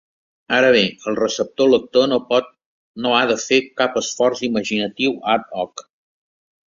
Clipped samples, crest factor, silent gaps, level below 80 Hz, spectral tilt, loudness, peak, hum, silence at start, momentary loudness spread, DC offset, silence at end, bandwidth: under 0.1%; 18 dB; 2.66-2.94 s; -60 dBFS; -3.5 dB/octave; -18 LUFS; -2 dBFS; none; 0.5 s; 7 LU; under 0.1%; 0.85 s; 7.6 kHz